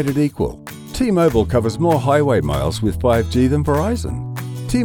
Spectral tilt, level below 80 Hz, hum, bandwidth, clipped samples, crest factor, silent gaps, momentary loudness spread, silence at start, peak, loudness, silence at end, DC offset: -7 dB/octave; -32 dBFS; none; 18.5 kHz; under 0.1%; 14 dB; none; 11 LU; 0 s; -4 dBFS; -18 LUFS; 0 s; under 0.1%